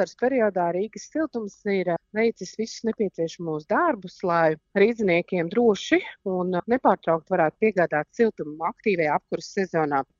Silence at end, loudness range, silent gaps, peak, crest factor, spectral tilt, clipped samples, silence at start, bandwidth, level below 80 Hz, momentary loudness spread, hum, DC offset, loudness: 0.15 s; 4 LU; none; -6 dBFS; 18 dB; -6 dB/octave; under 0.1%; 0 s; 7.6 kHz; -64 dBFS; 8 LU; none; under 0.1%; -24 LUFS